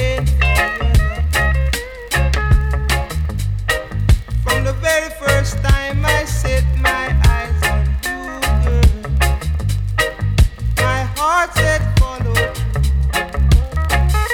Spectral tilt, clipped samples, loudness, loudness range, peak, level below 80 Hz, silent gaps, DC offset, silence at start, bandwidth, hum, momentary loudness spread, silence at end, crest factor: -5 dB/octave; under 0.1%; -17 LUFS; 1 LU; -2 dBFS; -18 dBFS; none; under 0.1%; 0 s; 17 kHz; none; 5 LU; 0 s; 12 dB